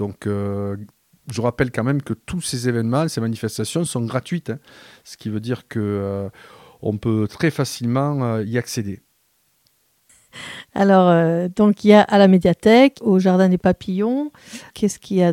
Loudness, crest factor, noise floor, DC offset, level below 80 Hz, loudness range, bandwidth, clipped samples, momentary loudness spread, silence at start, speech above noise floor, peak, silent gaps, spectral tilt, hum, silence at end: -19 LUFS; 18 dB; -64 dBFS; under 0.1%; -52 dBFS; 11 LU; 15.5 kHz; under 0.1%; 17 LU; 0 s; 45 dB; 0 dBFS; none; -6.5 dB/octave; none; 0 s